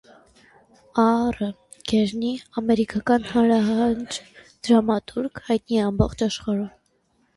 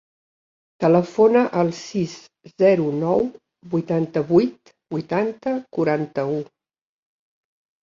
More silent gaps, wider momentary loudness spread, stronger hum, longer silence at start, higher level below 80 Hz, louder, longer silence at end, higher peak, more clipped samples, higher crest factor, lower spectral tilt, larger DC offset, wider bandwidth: neither; about the same, 11 LU vs 12 LU; neither; first, 0.95 s vs 0.8 s; first, -44 dBFS vs -62 dBFS; about the same, -22 LUFS vs -21 LUFS; second, 0.65 s vs 1.4 s; about the same, -4 dBFS vs -4 dBFS; neither; about the same, 18 dB vs 18 dB; second, -6 dB/octave vs -7.5 dB/octave; neither; first, 11.5 kHz vs 7.6 kHz